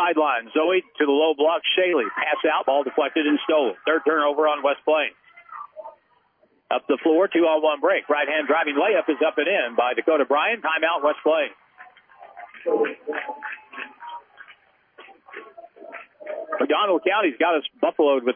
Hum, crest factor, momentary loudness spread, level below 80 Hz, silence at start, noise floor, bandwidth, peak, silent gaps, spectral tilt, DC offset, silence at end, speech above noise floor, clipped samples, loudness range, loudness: none; 16 dB; 19 LU; -82 dBFS; 0 s; -63 dBFS; 3.6 kHz; -8 dBFS; none; -7 dB/octave; under 0.1%; 0 s; 42 dB; under 0.1%; 10 LU; -21 LUFS